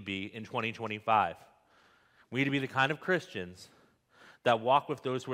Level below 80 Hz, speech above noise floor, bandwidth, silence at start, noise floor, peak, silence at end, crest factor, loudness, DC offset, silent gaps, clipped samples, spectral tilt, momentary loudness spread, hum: -76 dBFS; 33 dB; 15.5 kHz; 0 s; -65 dBFS; -12 dBFS; 0 s; 22 dB; -31 LUFS; under 0.1%; none; under 0.1%; -5.5 dB/octave; 11 LU; none